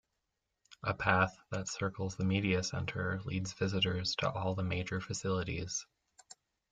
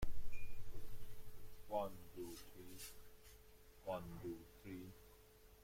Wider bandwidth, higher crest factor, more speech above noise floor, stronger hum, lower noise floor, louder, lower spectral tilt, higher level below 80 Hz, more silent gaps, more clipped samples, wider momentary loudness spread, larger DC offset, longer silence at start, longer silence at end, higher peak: second, 9.2 kHz vs 16.5 kHz; first, 24 dB vs 14 dB; first, 51 dB vs 15 dB; neither; first, -85 dBFS vs -65 dBFS; first, -35 LUFS vs -52 LUFS; about the same, -4.5 dB/octave vs -5.5 dB/octave; second, -62 dBFS vs -56 dBFS; neither; neither; second, 8 LU vs 18 LU; neither; first, 0.7 s vs 0 s; first, 0.4 s vs 0.15 s; first, -12 dBFS vs -28 dBFS